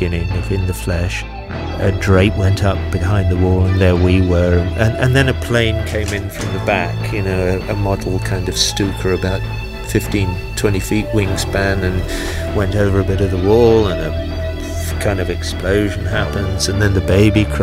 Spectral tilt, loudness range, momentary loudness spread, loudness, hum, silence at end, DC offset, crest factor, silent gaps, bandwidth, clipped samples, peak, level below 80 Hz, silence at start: -6 dB/octave; 4 LU; 9 LU; -16 LUFS; none; 0 s; under 0.1%; 16 dB; none; 16 kHz; under 0.1%; 0 dBFS; -26 dBFS; 0 s